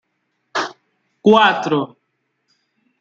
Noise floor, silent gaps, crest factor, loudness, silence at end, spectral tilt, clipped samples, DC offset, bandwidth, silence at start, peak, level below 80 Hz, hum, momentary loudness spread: -71 dBFS; none; 20 dB; -17 LUFS; 1.15 s; -5 dB/octave; under 0.1%; under 0.1%; 7.8 kHz; 0.55 s; 0 dBFS; -68 dBFS; none; 16 LU